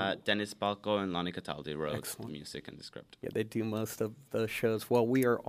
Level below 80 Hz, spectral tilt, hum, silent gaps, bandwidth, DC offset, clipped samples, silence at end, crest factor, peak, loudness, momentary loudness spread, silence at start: -68 dBFS; -5 dB/octave; none; none; 15.5 kHz; under 0.1%; under 0.1%; 0 s; 20 dB; -14 dBFS; -34 LUFS; 15 LU; 0 s